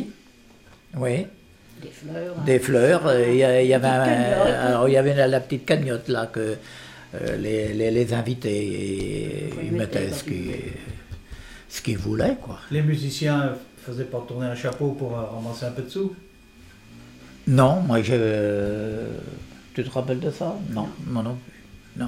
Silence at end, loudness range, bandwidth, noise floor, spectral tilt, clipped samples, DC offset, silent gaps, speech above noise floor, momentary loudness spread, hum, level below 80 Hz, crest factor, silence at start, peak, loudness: 0 s; 10 LU; 16 kHz; -51 dBFS; -6.5 dB/octave; under 0.1%; under 0.1%; none; 28 dB; 18 LU; none; -48 dBFS; 18 dB; 0 s; -6 dBFS; -23 LUFS